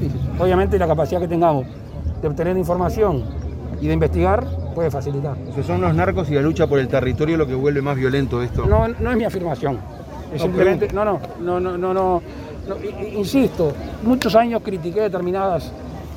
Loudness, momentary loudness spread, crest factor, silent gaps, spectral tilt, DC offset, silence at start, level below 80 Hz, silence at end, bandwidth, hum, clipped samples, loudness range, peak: -20 LUFS; 11 LU; 18 dB; none; -7.5 dB/octave; under 0.1%; 0 s; -32 dBFS; 0 s; 16 kHz; none; under 0.1%; 2 LU; 0 dBFS